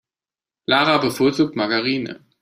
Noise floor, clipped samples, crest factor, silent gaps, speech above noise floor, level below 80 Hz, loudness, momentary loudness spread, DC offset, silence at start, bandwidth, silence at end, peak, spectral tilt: under -90 dBFS; under 0.1%; 20 dB; none; over 71 dB; -60 dBFS; -19 LUFS; 12 LU; under 0.1%; 0.7 s; 15.5 kHz; 0.25 s; -2 dBFS; -5 dB/octave